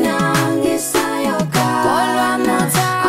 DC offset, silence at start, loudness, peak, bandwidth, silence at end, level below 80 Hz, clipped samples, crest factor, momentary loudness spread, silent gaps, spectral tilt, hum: under 0.1%; 0 s; -16 LUFS; -2 dBFS; 16.5 kHz; 0 s; -48 dBFS; under 0.1%; 14 dB; 2 LU; none; -4.5 dB/octave; none